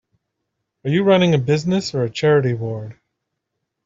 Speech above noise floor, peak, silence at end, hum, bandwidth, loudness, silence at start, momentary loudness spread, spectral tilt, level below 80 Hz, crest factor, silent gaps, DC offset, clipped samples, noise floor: 60 dB; -4 dBFS; 0.95 s; none; 7.8 kHz; -18 LUFS; 0.85 s; 15 LU; -6.5 dB/octave; -58 dBFS; 16 dB; none; under 0.1%; under 0.1%; -78 dBFS